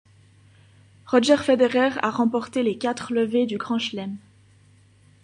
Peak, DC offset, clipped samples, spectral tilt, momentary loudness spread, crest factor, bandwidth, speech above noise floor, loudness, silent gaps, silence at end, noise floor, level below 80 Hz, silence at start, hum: -4 dBFS; under 0.1%; under 0.1%; -4.5 dB/octave; 10 LU; 20 dB; 10.5 kHz; 33 dB; -22 LUFS; none; 1.05 s; -55 dBFS; -64 dBFS; 1.05 s; none